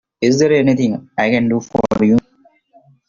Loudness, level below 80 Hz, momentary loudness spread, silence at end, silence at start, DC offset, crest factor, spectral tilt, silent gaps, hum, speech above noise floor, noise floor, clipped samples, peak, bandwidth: -15 LUFS; -48 dBFS; 6 LU; 0.9 s; 0.2 s; under 0.1%; 14 dB; -6 dB/octave; none; none; 40 dB; -54 dBFS; under 0.1%; -2 dBFS; 7.4 kHz